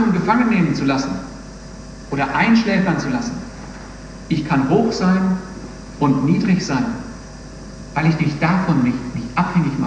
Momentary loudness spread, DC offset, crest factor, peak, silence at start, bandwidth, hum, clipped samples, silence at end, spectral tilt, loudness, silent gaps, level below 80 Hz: 20 LU; under 0.1%; 16 dB; -2 dBFS; 0 s; 9.4 kHz; none; under 0.1%; 0 s; -6.5 dB/octave; -18 LUFS; none; -40 dBFS